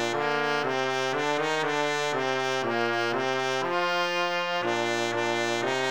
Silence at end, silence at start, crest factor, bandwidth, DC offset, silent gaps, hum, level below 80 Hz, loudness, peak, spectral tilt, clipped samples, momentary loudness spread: 0 s; 0 s; 16 dB; over 20 kHz; 0.3%; none; none; -74 dBFS; -26 LUFS; -12 dBFS; -3.5 dB/octave; under 0.1%; 1 LU